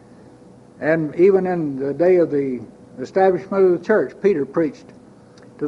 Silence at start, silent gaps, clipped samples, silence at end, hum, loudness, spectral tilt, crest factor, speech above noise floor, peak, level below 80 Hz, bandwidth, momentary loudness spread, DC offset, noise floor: 0.8 s; none; under 0.1%; 0 s; none; -19 LUFS; -8.5 dB/octave; 14 dB; 27 dB; -4 dBFS; -60 dBFS; 7.2 kHz; 10 LU; under 0.1%; -45 dBFS